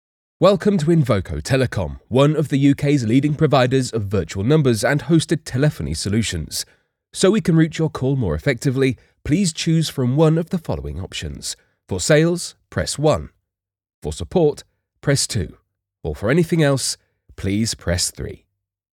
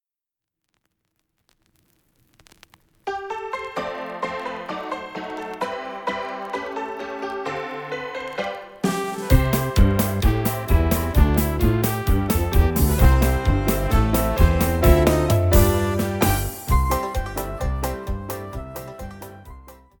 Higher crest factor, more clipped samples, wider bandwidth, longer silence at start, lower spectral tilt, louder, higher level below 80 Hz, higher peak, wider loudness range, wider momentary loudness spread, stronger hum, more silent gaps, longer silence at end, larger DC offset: about the same, 16 dB vs 20 dB; neither; second, 16.5 kHz vs 19 kHz; second, 0.4 s vs 3.05 s; about the same, -5.5 dB/octave vs -6 dB/octave; first, -19 LUFS vs -22 LUFS; second, -42 dBFS vs -26 dBFS; about the same, -2 dBFS vs -2 dBFS; second, 4 LU vs 12 LU; about the same, 13 LU vs 14 LU; neither; first, 13.94-14.02 s vs none; first, 0.6 s vs 0.25 s; neither